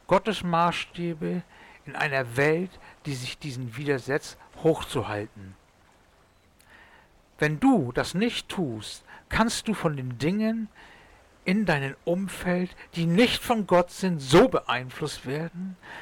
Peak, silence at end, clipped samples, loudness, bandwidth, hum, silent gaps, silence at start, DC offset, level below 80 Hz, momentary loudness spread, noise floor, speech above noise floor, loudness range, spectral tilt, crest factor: -12 dBFS; 0 s; under 0.1%; -26 LUFS; 18.5 kHz; none; none; 0.1 s; under 0.1%; -52 dBFS; 13 LU; -60 dBFS; 34 dB; 7 LU; -5.5 dB/octave; 16 dB